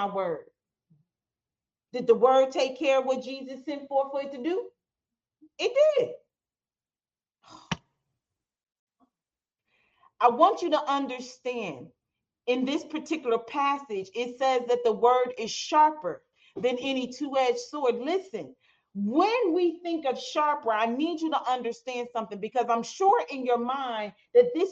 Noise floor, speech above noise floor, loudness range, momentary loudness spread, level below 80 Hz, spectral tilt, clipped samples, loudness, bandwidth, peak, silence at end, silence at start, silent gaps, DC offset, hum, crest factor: under -90 dBFS; over 64 dB; 5 LU; 14 LU; -74 dBFS; -4.5 dB/octave; under 0.1%; -27 LUFS; 7.8 kHz; -8 dBFS; 0 s; 0 s; 8.79-8.87 s; under 0.1%; none; 20 dB